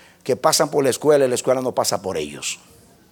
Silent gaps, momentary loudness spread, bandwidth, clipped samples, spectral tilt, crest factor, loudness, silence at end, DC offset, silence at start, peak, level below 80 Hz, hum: none; 10 LU; 18.5 kHz; under 0.1%; -3.5 dB/octave; 18 dB; -20 LUFS; 0.55 s; under 0.1%; 0.25 s; -2 dBFS; -60 dBFS; none